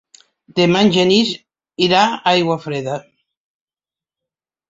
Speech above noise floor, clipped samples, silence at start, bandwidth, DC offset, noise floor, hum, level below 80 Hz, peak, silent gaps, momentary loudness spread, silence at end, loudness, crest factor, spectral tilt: over 75 dB; under 0.1%; 0.55 s; 7.8 kHz; under 0.1%; under -90 dBFS; none; -58 dBFS; -2 dBFS; none; 14 LU; 1.7 s; -15 LUFS; 18 dB; -5 dB/octave